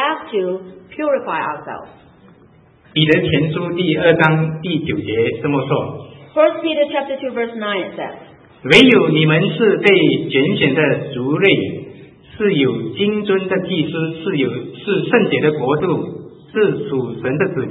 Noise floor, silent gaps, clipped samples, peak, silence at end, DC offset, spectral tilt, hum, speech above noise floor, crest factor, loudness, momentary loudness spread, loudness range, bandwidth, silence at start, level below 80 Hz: -48 dBFS; none; under 0.1%; 0 dBFS; 0 s; under 0.1%; -7 dB/octave; none; 32 dB; 16 dB; -16 LUFS; 14 LU; 6 LU; 11 kHz; 0 s; -54 dBFS